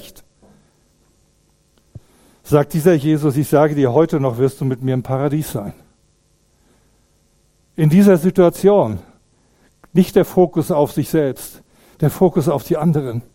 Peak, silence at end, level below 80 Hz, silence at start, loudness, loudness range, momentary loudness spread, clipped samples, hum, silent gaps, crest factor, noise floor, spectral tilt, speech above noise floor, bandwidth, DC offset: 0 dBFS; 0.15 s; -48 dBFS; 0.05 s; -16 LUFS; 6 LU; 10 LU; under 0.1%; none; none; 18 dB; -59 dBFS; -7.5 dB/octave; 43 dB; 16.5 kHz; under 0.1%